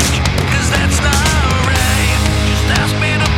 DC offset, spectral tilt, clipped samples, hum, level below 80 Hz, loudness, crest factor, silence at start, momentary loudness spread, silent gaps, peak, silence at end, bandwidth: under 0.1%; -4 dB/octave; under 0.1%; none; -18 dBFS; -13 LUFS; 12 dB; 0 s; 2 LU; none; 0 dBFS; 0 s; 17 kHz